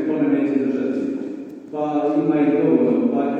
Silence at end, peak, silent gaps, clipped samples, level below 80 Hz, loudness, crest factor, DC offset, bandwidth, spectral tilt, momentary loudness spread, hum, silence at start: 0 s; -4 dBFS; none; under 0.1%; -72 dBFS; -20 LUFS; 14 dB; under 0.1%; 5 kHz; -9 dB/octave; 12 LU; none; 0 s